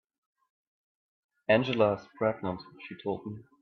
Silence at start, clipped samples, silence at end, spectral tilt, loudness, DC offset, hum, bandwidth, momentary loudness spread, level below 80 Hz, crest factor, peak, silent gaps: 1.5 s; under 0.1%; 0.2 s; -7.5 dB/octave; -30 LUFS; under 0.1%; none; 6.4 kHz; 15 LU; -68 dBFS; 22 dB; -10 dBFS; none